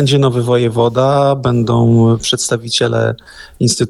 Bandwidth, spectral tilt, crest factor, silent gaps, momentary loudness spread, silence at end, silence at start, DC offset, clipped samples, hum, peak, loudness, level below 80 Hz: 12.5 kHz; -5.5 dB/octave; 12 dB; none; 5 LU; 0 s; 0 s; under 0.1%; under 0.1%; none; -2 dBFS; -13 LUFS; -42 dBFS